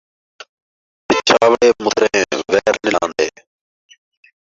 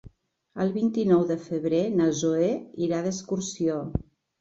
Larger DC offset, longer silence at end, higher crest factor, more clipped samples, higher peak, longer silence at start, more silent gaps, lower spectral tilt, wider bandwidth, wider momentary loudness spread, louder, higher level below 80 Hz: neither; first, 1.2 s vs 0.4 s; about the same, 16 dB vs 16 dB; neither; first, 0 dBFS vs -10 dBFS; first, 1.1 s vs 0.05 s; neither; second, -2.5 dB/octave vs -6 dB/octave; about the same, 7.8 kHz vs 8 kHz; about the same, 7 LU vs 9 LU; first, -15 LUFS vs -26 LUFS; about the same, -54 dBFS vs -50 dBFS